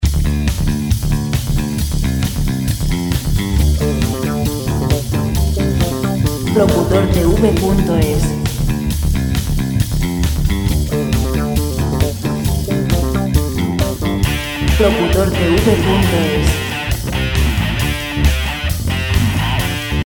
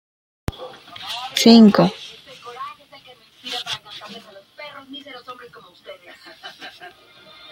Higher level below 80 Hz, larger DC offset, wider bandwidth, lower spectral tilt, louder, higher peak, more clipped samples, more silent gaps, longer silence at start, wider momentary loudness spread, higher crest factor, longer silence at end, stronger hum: first, -20 dBFS vs -52 dBFS; neither; first, 19 kHz vs 15.5 kHz; about the same, -5.5 dB/octave vs -5 dB/octave; about the same, -16 LUFS vs -16 LUFS; about the same, 0 dBFS vs 0 dBFS; neither; neither; second, 0 s vs 0.6 s; second, 5 LU vs 28 LU; second, 14 dB vs 20 dB; second, 0 s vs 0.65 s; neither